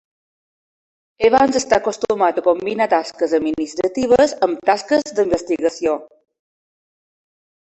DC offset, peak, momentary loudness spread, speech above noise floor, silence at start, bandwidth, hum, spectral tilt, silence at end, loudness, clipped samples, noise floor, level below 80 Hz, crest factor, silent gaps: under 0.1%; 0 dBFS; 7 LU; over 73 dB; 1.2 s; 8.4 kHz; none; -4 dB/octave; 1.6 s; -18 LUFS; under 0.1%; under -90 dBFS; -52 dBFS; 18 dB; none